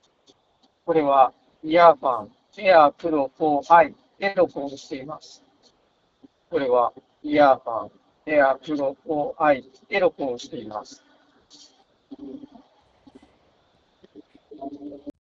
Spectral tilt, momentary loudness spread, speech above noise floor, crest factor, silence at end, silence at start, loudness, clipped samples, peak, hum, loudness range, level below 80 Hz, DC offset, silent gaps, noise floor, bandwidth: -5.5 dB/octave; 23 LU; 44 dB; 22 dB; 0.15 s; 0.85 s; -21 LUFS; under 0.1%; 0 dBFS; none; 11 LU; -62 dBFS; under 0.1%; none; -65 dBFS; 7.6 kHz